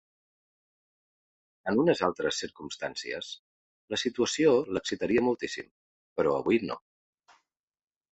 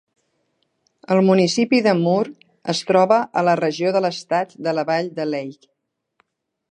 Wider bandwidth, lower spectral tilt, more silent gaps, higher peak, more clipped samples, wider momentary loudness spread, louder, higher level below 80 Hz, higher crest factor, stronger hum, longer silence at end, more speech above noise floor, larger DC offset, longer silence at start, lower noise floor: second, 8.4 kHz vs 9.8 kHz; about the same, -4.5 dB/octave vs -5.5 dB/octave; first, 3.39-3.88 s, 5.71-6.16 s vs none; second, -10 dBFS vs -2 dBFS; neither; first, 14 LU vs 10 LU; second, -29 LUFS vs -19 LUFS; first, -64 dBFS vs -72 dBFS; about the same, 20 dB vs 18 dB; neither; first, 1.35 s vs 1.2 s; second, 46 dB vs 51 dB; neither; first, 1.65 s vs 1.1 s; first, -75 dBFS vs -69 dBFS